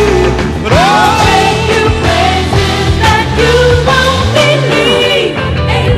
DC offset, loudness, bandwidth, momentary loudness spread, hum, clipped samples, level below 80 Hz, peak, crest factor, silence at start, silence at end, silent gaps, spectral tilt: under 0.1%; -9 LUFS; 14.5 kHz; 4 LU; none; 0.4%; -20 dBFS; 0 dBFS; 8 dB; 0 s; 0 s; none; -5 dB/octave